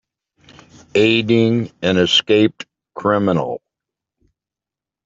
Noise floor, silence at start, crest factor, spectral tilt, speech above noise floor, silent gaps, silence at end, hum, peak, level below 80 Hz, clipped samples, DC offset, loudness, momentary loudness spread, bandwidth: -88 dBFS; 0.95 s; 16 dB; -5.5 dB/octave; 72 dB; none; 1.5 s; none; -2 dBFS; -58 dBFS; under 0.1%; under 0.1%; -16 LUFS; 14 LU; 7.8 kHz